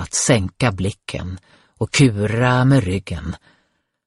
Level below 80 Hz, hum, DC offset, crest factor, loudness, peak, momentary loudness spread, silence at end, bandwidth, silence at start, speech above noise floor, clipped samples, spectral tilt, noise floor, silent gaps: -42 dBFS; none; under 0.1%; 18 dB; -18 LUFS; -2 dBFS; 16 LU; 0.7 s; 11.5 kHz; 0 s; 48 dB; under 0.1%; -5 dB/octave; -66 dBFS; none